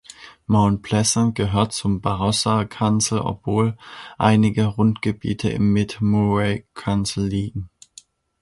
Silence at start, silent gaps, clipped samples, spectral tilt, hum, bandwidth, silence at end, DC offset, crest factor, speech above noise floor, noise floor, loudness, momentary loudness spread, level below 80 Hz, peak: 0.2 s; none; under 0.1%; -5.5 dB/octave; none; 11.5 kHz; 0.75 s; under 0.1%; 20 dB; 30 dB; -50 dBFS; -20 LUFS; 9 LU; -44 dBFS; -2 dBFS